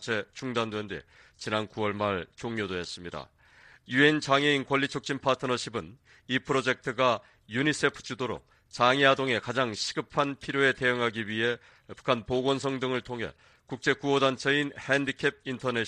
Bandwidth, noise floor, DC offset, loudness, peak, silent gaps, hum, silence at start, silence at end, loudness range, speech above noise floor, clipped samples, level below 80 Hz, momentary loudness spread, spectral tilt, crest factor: 11 kHz; -57 dBFS; under 0.1%; -28 LUFS; -6 dBFS; none; none; 0 s; 0 s; 4 LU; 28 dB; under 0.1%; -62 dBFS; 13 LU; -4.5 dB/octave; 22 dB